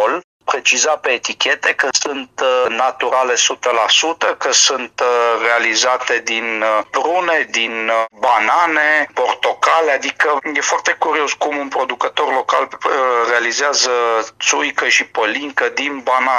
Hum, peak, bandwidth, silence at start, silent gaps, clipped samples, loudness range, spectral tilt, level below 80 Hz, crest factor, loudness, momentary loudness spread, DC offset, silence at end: none; 0 dBFS; 12 kHz; 0 s; 0.24-0.40 s; under 0.1%; 2 LU; 0.5 dB/octave; -68 dBFS; 16 dB; -15 LUFS; 5 LU; under 0.1%; 0 s